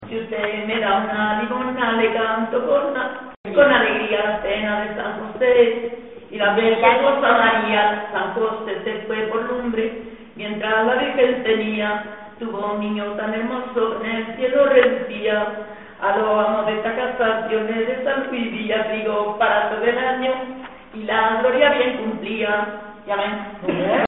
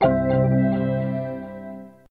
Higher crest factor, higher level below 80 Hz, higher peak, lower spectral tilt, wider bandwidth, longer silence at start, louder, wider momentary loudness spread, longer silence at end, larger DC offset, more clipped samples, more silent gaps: about the same, 20 dB vs 16 dB; second, -54 dBFS vs -44 dBFS; first, 0 dBFS vs -6 dBFS; second, -2 dB/octave vs -11 dB/octave; second, 4 kHz vs 4.5 kHz; about the same, 0 s vs 0 s; about the same, -20 LUFS vs -22 LUFS; second, 12 LU vs 18 LU; second, 0 s vs 0.2 s; first, 0.2% vs under 0.1%; neither; first, 3.37-3.44 s vs none